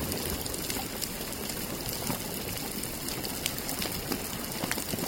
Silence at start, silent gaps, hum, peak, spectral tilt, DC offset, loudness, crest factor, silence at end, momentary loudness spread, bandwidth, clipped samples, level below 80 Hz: 0 s; none; none; -6 dBFS; -3 dB/octave; under 0.1%; -32 LUFS; 28 dB; 0 s; 2 LU; 17 kHz; under 0.1%; -48 dBFS